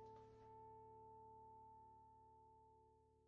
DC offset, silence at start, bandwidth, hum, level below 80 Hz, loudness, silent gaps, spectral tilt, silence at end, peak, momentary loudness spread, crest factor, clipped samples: under 0.1%; 0 s; 6.6 kHz; none; -82 dBFS; -65 LUFS; none; -7 dB/octave; 0 s; -52 dBFS; 6 LU; 14 dB; under 0.1%